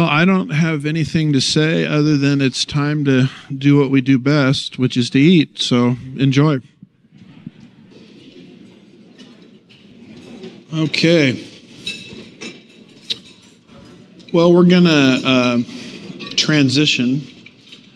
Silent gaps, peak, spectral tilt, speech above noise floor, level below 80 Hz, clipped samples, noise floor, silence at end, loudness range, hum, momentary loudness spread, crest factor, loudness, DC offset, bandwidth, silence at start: none; 0 dBFS; -5.5 dB/octave; 32 dB; -54 dBFS; under 0.1%; -46 dBFS; 0.2 s; 8 LU; none; 19 LU; 16 dB; -15 LUFS; under 0.1%; 10.5 kHz; 0 s